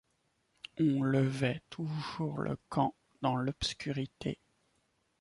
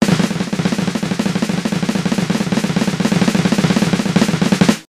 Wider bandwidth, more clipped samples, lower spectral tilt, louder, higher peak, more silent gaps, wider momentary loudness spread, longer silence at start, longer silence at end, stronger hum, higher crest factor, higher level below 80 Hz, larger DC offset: second, 11.5 kHz vs 15 kHz; neither; about the same, -6.5 dB/octave vs -5.5 dB/octave; second, -34 LUFS vs -16 LUFS; second, -16 dBFS vs 0 dBFS; neither; first, 11 LU vs 4 LU; first, 0.75 s vs 0 s; first, 0.85 s vs 0.15 s; neither; about the same, 18 dB vs 16 dB; second, -60 dBFS vs -44 dBFS; neither